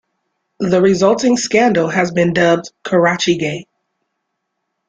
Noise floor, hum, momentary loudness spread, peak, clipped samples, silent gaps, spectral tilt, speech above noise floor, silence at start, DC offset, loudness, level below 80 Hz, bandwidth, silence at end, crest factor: -73 dBFS; none; 6 LU; -2 dBFS; under 0.1%; none; -5 dB/octave; 60 dB; 0.6 s; under 0.1%; -14 LUFS; -54 dBFS; 9.4 kHz; 1.25 s; 14 dB